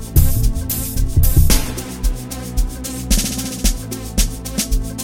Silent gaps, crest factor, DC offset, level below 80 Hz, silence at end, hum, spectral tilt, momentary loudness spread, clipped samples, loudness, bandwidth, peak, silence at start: none; 16 dB; under 0.1%; -18 dBFS; 0 s; none; -4 dB/octave; 9 LU; under 0.1%; -20 LUFS; 17 kHz; 0 dBFS; 0 s